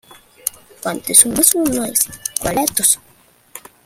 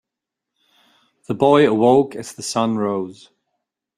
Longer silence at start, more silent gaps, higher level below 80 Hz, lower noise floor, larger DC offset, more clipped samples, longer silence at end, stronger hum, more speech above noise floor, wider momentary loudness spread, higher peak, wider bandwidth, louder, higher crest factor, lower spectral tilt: second, 0.45 s vs 1.3 s; neither; first, -48 dBFS vs -62 dBFS; second, -52 dBFS vs -84 dBFS; neither; first, 0.1% vs under 0.1%; second, 0.25 s vs 0.85 s; neither; second, 36 dB vs 67 dB; about the same, 15 LU vs 15 LU; about the same, 0 dBFS vs -2 dBFS; first, over 20 kHz vs 14 kHz; about the same, -15 LUFS vs -17 LUFS; about the same, 18 dB vs 18 dB; second, -2 dB/octave vs -5.5 dB/octave